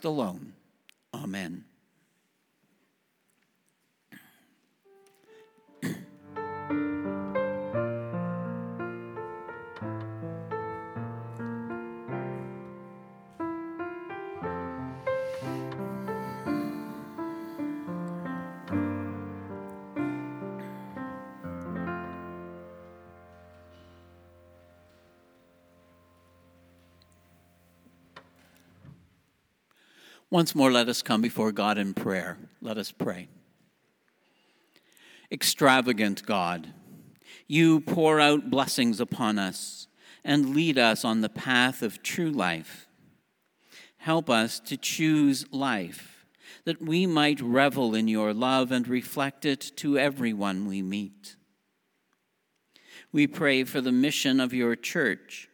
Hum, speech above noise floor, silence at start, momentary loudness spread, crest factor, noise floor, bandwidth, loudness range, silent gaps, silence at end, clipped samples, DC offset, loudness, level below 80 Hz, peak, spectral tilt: none; 50 dB; 0 s; 17 LU; 26 dB; -76 dBFS; over 20 kHz; 14 LU; none; 0.1 s; under 0.1%; under 0.1%; -28 LUFS; -70 dBFS; -4 dBFS; -4.5 dB/octave